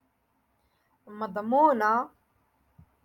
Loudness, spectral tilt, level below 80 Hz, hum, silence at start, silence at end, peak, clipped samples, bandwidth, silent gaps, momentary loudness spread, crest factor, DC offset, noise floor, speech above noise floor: -25 LUFS; -6.5 dB/octave; -72 dBFS; none; 1.1 s; 1 s; -10 dBFS; under 0.1%; 17.5 kHz; none; 16 LU; 20 dB; under 0.1%; -72 dBFS; 47 dB